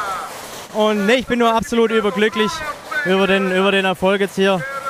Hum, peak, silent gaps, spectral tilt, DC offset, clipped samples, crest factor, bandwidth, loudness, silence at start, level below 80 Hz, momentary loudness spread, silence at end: none; -2 dBFS; none; -4.5 dB/octave; under 0.1%; under 0.1%; 16 dB; 15.5 kHz; -17 LUFS; 0 s; -48 dBFS; 10 LU; 0 s